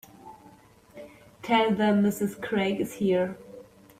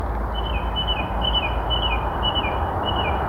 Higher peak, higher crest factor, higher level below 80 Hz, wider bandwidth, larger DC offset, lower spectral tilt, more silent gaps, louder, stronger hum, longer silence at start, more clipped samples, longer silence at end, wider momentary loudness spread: about the same, -10 dBFS vs -8 dBFS; about the same, 18 dB vs 14 dB; second, -64 dBFS vs -28 dBFS; first, 15.5 kHz vs 12.5 kHz; neither; about the same, -6 dB/octave vs -6.5 dB/octave; neither; second, -26 LUFS vs -23 LUFS; neither; first, 0.25 s vs 0 s; neither; first, 0.35 s vs 0 s; first, 24 LU vs 4 LU